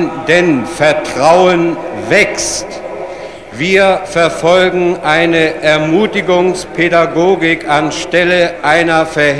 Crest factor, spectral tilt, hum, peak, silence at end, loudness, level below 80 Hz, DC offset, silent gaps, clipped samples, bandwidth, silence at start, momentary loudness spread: 12 dB; -4.5 dB/octave; none; 0 dBFS; 0 s; -11 LUFS; -42 dBFS; 0.5%; none; 0.3%; 11 kHz; 0 s; 9 LU